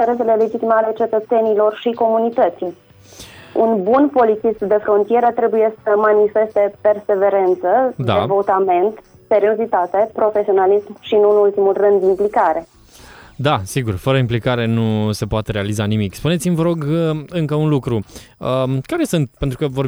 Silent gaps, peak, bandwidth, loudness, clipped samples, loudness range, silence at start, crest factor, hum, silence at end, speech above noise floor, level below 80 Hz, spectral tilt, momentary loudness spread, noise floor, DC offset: none; -2 dBFS; over 20 kHz; -16 LUFS; under 0.1%; 4 LU; 0 s; 14 dB; none; 0 s; 26 dB; -44 dBFS; -7 dB/octave; 7 LU; -42 dBFS; under 0.1%